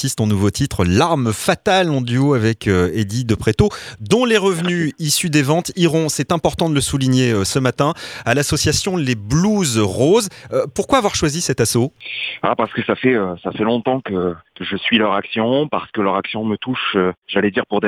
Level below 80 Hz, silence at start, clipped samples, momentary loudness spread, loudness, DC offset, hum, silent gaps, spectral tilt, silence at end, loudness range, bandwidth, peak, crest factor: -42 dBFS; 0 s; under 0.1%; 6 LU; -17 LUFS; under 0.1%; none; 17.18-17.22 s; -5 dB/octave; 0 s; 2 LU; 17 kHz; 0 dBFS; 18 dB